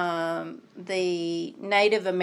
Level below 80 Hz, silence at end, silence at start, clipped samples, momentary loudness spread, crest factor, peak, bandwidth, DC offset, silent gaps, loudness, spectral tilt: -86 dBFS; 0 s; 0 s; under 0.1%; 14 LU; 18 dB; -10 dBFS; 12 kHz; under 0.1%; none; -26 LUFS; -4.5 dB/octave